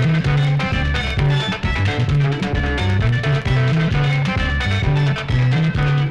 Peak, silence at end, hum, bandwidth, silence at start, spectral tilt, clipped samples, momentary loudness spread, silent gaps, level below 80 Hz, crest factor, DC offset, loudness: -4 dBFS; 0 s; none; 8.8 kHz; 0 s; -7 dB/octave; under 0.1%; 3 LU; none; -26 dBFS; 14 dB; under 0.1%; -18 LUFS